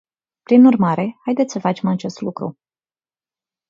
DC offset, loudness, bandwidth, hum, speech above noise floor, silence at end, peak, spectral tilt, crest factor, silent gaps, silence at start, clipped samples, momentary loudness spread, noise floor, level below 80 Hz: under 0.1%; -17 LUFS; 7.4 kHz; none; over 74 dB; 1.2 s; -2 dBFS; -7.5 dB/octave; 18 dB; none; 0.5 s; under 0.1%; 15 LU; under -90 dBFS; -64 dBFS